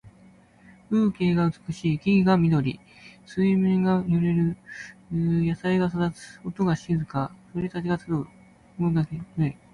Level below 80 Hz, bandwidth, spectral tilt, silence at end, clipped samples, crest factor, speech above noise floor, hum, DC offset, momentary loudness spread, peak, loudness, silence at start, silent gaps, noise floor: -52 dBFS; 10.5 kHz; -8.5 dB/octave; 0.2 s; under 0.1%; 16 dB; 30 dB; none; under 0.1%; 11 LU; -8 dBFS; -25 LUFS; 0.05 s; none; -54 dBFS